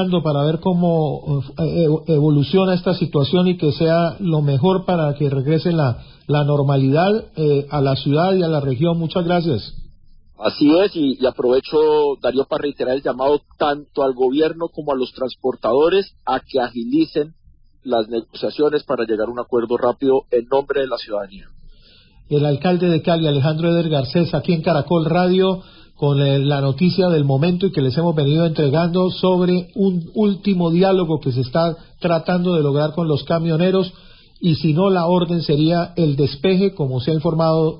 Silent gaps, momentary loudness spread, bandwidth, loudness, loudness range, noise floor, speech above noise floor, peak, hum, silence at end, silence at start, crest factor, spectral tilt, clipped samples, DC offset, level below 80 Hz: none; 7 LU; 5.4 kHz; -18 LUFS; 3 LU; -48 dBFS; 31 dB; -4 dBFS; none; 0 s; 0 s; 14 dB; -12.5 dB/octave; under 0.1%; under 0.1%; -48 dBFS